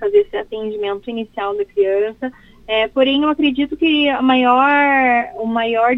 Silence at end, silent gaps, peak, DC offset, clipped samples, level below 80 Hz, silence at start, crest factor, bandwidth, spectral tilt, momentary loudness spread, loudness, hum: 0 s; none; 0 dBFS; under 0.1%; under 0.1%; -50 dBFS; 0 s; 16 dB; 5.4 kHz; -6 dB/octave; 11 LU; -16 LUFS; none